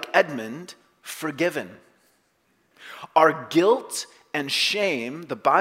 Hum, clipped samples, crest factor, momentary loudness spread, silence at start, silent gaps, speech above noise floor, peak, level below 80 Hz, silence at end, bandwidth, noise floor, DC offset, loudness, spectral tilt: none; under 0.1%; 22 dB; 21 LU; 0 s; none; 43 dB; -2 dBFS; -76 dBFS; 0 s; 16 kHz; -67 dBFS; under 0.1%; -23 LUFS; -3.5 dB/octave